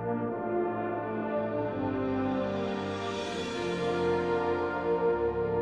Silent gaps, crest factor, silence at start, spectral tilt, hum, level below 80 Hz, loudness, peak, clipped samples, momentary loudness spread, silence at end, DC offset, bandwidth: none; 12 dB; 0 s; -6.5 dB/octave; none; -56 dBFS; -31 LUFS; -18 dBFS; under 0.1%; 5 LU; 0 s; under 0.1%; 10 kHz